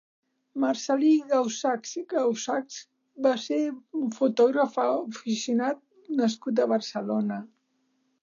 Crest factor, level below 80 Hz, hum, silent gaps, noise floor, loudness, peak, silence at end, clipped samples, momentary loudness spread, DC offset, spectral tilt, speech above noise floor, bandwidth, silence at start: 16 dB; -86 dBFS; none; none; -72 dBFS; -27 LUFS; -12 dBFS; 0.75 s; under 0.1%; 9 LU; under 0.1%; -4.5 dB/octave; 47 dB; 7.4 kHz; 0.55 s